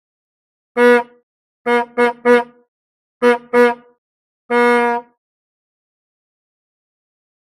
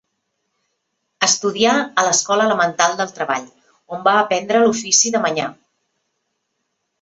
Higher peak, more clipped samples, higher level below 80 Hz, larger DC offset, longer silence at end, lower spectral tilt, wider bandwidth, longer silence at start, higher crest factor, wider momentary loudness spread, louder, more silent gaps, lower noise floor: about the same, 0 dBFS vs 0 dBFS; neither; about the same, -68 dBFS vs -66 dBFS; neither; first, 2.4 s vs 1.5 s; first, -4 dB/octave vs -1.5 dB/octave; first, 14 kHz vs 8.4 kHz; second, 0.75 s vs 1.2 s; about the same, 18 dB vs 18 dB; first, 14 LU vs 9 LU; about the same, -15 LUFS vs -16 LUFS; first, 1.23-1.65 s, 2.68-3.20 s, 3.98-4.49 s vs none; first, under -90 dBFS vs -73 dBFS